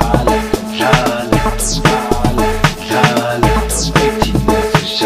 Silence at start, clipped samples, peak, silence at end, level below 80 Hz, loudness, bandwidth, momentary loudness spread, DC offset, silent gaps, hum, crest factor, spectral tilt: 0 s; under 0.1%; 0 dBFS; 0 s; -22 dBFS; -14 LUFS; 15.5 kHz; 3 LU; 0.4%; none; none; 14 dB; -4.5 dB/octave